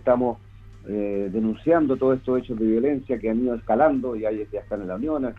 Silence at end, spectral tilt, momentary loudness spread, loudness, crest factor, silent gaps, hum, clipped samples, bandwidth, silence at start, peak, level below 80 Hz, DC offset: 0 s; -9.5 dB/octave; 11 LU; -24 LUFS; 16 dB; none; none; under 0.1%; 4.6 kHz; 0.05 s; -6 dBFS; -48 dBFS; under 0.1%